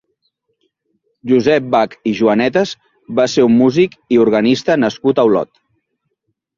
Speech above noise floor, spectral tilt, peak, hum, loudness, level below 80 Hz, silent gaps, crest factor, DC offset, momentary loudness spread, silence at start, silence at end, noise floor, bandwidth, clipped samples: 58 dB; -6 dB/octave; -2 dBFS; none; -14 LUFS; -56 dBFS; none; 14 dB; under 0.1%; 9 LU; 1.25 s; 1.15 s; -71 dBFS; 7.4 kHz; under 0.1%